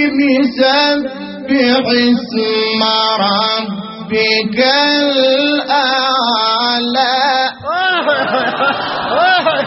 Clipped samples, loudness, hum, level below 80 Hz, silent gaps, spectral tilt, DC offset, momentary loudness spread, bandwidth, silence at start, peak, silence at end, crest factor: under 0.1%; -12 LUFS; none; -56 dBFS; none; -1 dB/octave; under 0.1%; 6 LU; 6 kHz; 0 s; 0 dBFS; 0 s; 14 dB